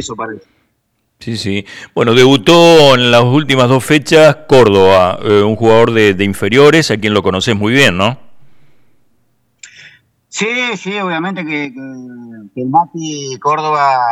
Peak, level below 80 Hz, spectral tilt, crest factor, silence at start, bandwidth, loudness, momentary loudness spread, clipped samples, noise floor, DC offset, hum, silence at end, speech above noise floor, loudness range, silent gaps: 0 dBFS; -46 dBFS; -5 dB/octave; 12 dB; 0 s; 16.5 kHz; -10 LUFS; 16 LU; under 0.1%; -64 dBFS; under 0.1%; none; 0 s; 53 dB; 12 LU; none